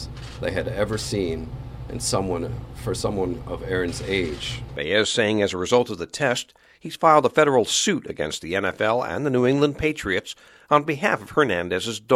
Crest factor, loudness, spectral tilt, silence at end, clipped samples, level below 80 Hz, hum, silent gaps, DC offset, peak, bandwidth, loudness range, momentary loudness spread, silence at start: 22 dB; -23 LUFS; -4 dB/octave; 0 s; under 0.1%; -44 dBFS; none; none; under 0.1%; -2 dBFS; 15.5 kHz; 6 LU; 13 LU; 0 s